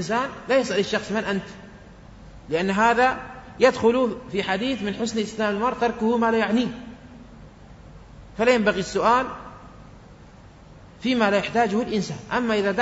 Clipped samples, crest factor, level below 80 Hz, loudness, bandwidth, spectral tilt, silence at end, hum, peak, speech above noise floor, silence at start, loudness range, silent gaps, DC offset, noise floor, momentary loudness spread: under 0.1%; 18 dB; -50 dBFS; -23 LUFS; 8 kHz; -5 dB/octave; 0 s; none; -4 dBFS; 24 dB; 0 s; 3 LU; none; under 0.1%; -46 dBFS; 13 LU